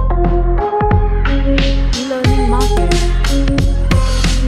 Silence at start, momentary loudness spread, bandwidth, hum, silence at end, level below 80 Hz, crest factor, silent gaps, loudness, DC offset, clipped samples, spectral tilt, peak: 0 s; 2 LU; 12 kHz; none; 0 s; -14 dBFS; 12 dB; none; -15 LUFS; under 0.1%; under 0.1%; -5.5 dB/octave; 0 dBFS